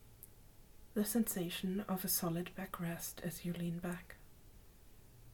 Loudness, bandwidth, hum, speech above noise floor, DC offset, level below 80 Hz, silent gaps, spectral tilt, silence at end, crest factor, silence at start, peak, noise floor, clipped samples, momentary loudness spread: -40 LUFS; 19 kHz; none; 20 dB; under 0.1%; -62 dBFS; none; -4.5 dB/octave; 0 s; 18 dB; 0 s; -24 dBFS; -60 dBFS; under 0.1%; 22 LU